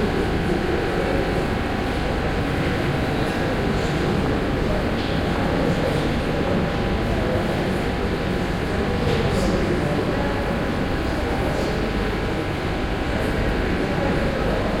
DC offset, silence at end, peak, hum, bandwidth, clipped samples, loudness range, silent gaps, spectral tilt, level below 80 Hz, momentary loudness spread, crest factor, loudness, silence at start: under 0.1%; 0 s; -8 dBFS; none; 16.5 kHz; under 0.1%; 1 LU; none; -6.5 dB/octave; -30 dBFS; 3 LU; 14 dB; -23 LUFS; 0 s